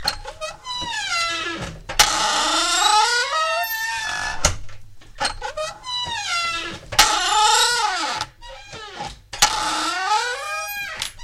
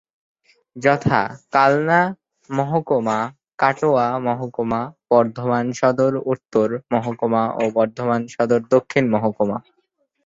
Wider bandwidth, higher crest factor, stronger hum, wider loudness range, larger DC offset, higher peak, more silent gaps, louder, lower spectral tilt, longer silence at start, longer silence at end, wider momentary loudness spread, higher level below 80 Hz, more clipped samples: first, 16 kHz vs 7.8 kHz; about the same, 22 dB vs 18 dB; neither; first, 5 LU vs 1 LU; neither; about the same, 0 dBFS vs -2 dBFS; second, none vs 3.54-3.58 s; about the same, -20 LUFS vs -20 LUFS; second, 0 dB/octave vs -7 dB/octave; second, 0 s vs 0.75 s; second, 0 s vs 0.65 s; first, 16 LU vs 7 LU; first, -40 dBFS vs -58 dBFS; neither